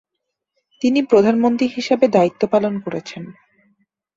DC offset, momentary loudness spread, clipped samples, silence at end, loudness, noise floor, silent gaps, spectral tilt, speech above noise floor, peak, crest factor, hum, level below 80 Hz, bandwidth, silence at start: under 0.1%; 16 LU; under 0.1%; 0.85 s; -17 LUFS; -79 dBFS; none; -6.5 dB/octave; 62 dB; -2 dBFS; 18 dB; none; -60 dBFS; 7.8 kHz; 0.8 s